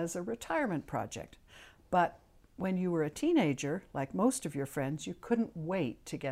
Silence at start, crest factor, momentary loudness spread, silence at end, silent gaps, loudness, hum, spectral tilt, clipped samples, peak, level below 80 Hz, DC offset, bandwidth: 0 s; 18 dB; 9 LU; 0 s; none; -34 LUFS; none; -5.5 dB/octave; under 0.1%; -16 dBFS; -62 dBFS; under 0.1%; 16 kHz